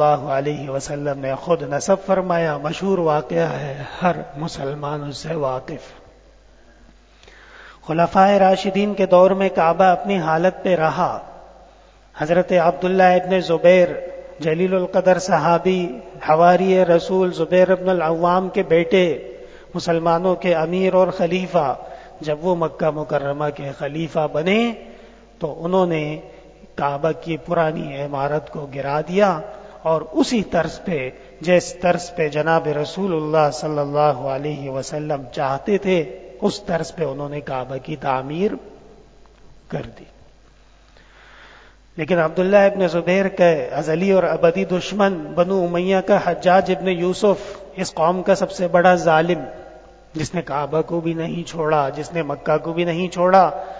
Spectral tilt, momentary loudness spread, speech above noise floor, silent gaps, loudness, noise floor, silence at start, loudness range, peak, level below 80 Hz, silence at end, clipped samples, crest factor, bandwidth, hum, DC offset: -6 dB/octave; 13 LU; 31 dB; none; -19 LUFS; -50 dBFS; 0 s; 8 LU; 0 dBFS; -50 dBFS; 0 s; under 0.1%; 18 dB; 8 kHz; none; under 0.1%